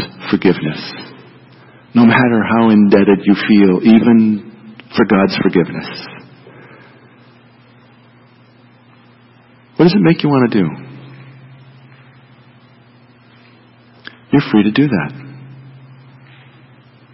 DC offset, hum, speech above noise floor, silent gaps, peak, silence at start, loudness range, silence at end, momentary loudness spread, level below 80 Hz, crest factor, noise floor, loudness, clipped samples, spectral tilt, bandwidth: under 0.1%; none; 35 dB; none; 0 dBFS; 0 s; 10 LU; 1.65 s; 21 LU; -54 dBFS; 16 dB; -46 dBFS; -12 LUFS; under 0.1%; -10.5 dB/octave; 5.8 kHz